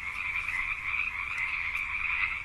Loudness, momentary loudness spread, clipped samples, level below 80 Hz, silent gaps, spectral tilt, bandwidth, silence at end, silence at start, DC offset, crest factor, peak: -30 LUFS; 3 LU; under 0.1%; -50 dBFS; none; -2 dB/octave; 13 kHz; 0 s; 0 s; under 0.1%; 16 dB; -16 dBFS